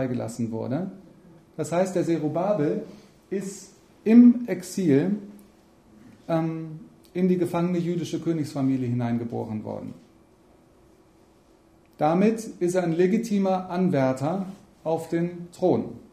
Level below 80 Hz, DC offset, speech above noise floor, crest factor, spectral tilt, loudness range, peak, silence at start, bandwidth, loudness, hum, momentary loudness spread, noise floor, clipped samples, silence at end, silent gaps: -64 dBFS; under 0.1%; 33 dB; 20 dB; -7.5 dB/octave; 7 LU; -6 dBFS; 0 s; 14 kHz; -25 LUFS; none; 14 LU; -57 dBFS; under 0.1%; 0.1 s; none